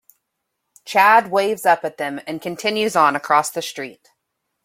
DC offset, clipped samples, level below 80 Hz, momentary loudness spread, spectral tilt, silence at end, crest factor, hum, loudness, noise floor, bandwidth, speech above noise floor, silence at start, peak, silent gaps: under 0.1%; under 0.1%; -70 dBFS; 15 LU; -3 dB/octave; 0.7 s; 18 dB; none; -18 LUFS; -76 dBFS; 16.5 kHz; 58 dB; 0.85 s; -2 dBFS; none